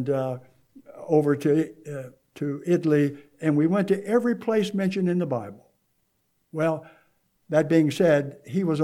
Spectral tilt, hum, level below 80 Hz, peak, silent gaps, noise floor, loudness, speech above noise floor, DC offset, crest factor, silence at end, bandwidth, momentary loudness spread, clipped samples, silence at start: -7.5 dB/octave; none; -74 dBFS; -8 dBFS; none; -71 dBFS; -24 LUFS; 48 dB; under 0.1%; 16 dB; 0 s; 14.5 kHz; 16 LU; under 0.1%; 0 s